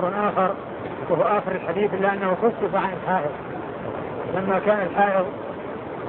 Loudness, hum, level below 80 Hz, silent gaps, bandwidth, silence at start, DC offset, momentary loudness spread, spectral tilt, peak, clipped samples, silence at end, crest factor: -24 LUFS; none; -56 dBFS; none; 4.3 kHz; 0 s; under 0.1%; 11 LU; -10.5 dB/octave; -8 dBFS; under 0.1%; 0 s; 16 dB